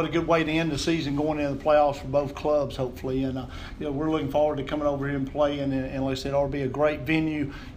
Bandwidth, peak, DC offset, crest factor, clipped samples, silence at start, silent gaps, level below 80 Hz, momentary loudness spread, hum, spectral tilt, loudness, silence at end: 15.5 kHz; -10 dBFS; under 0.1%; 16 dB; under 0.1%; 0 s; none; -44 dBFS; 7 LU; none; -6.5 dB/octave; -26 LUFS; 0 s